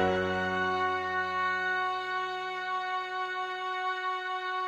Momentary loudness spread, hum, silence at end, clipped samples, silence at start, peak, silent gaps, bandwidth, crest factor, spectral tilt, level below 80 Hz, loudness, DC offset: 5 LU; none; 0 s; under 0.1%; 0 s; -14 dBFS; none; 12 kHz; 16 dB; -4.5 dB/octave; -68 dBFS; -31 LUFS; under 0.1%